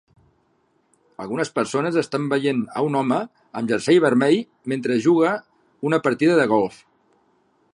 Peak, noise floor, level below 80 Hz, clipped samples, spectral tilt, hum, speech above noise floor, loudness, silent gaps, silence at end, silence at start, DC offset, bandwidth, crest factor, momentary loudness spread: -4 dBFS; -65 dBFS; -68 dBFS; under 0.1%; -6 dB/octave; none; 45 dB; -21 LUFS; none; 1.05 s; 1.2 s; under 0.1%; 11 kHz; 18 dB; 12 LU